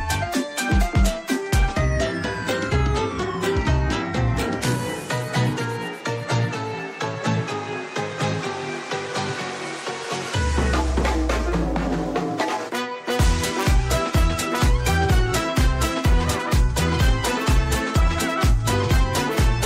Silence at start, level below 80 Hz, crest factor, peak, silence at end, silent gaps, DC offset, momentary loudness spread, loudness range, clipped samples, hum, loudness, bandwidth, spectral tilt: 0 s; -26 dBFS; 12 dB; -10 dBFS; 0 s; none; under 0.1%; 7 LU; 5 LU; under 0.1%; none; -23 LUFS; 16 kHz; -5 dB/octave